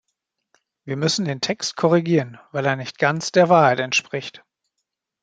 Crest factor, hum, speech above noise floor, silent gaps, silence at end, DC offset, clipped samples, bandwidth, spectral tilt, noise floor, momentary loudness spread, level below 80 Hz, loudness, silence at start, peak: 20 dB; none; 60 dB; none; 0.85 s; under 0.1%; under 0.1%; 9.2 kHz; -4.5 dB/octave; -80 dBFS; 14 LU; -66 dBFS; -20 LUFS; 0.85 s; -2 dBFS